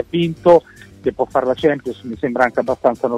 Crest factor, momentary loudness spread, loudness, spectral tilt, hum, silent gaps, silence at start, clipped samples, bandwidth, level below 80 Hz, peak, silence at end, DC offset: 16 dB; 11 LU; -17 LUFS; -7 dB/octave; none; none; 0 s; under 0.1%; 9.8 kHz; -50 dBFS; -2 dBFS; 0 s; under 0.1%